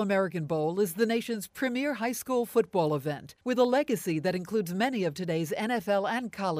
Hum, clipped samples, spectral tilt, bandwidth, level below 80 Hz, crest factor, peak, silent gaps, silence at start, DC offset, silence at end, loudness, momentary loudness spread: none; under 0.1%; -5.5 dB/octave; 15.5 kHz; -70 dBFS; 16 dB; -12 dBFS; none; 0 s; under 0.1%; 0 s; -29 LUFS; 5 LU